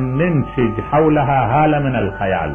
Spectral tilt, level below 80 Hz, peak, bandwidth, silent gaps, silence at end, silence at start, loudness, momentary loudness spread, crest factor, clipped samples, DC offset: -10 dB/octave; -36 dBFS; -4 dBFS; 3.5 kHz; none; 0 s; 0 s; -16 LUFS; 5 LU; 12 dB; under 0.1%; under 0.1%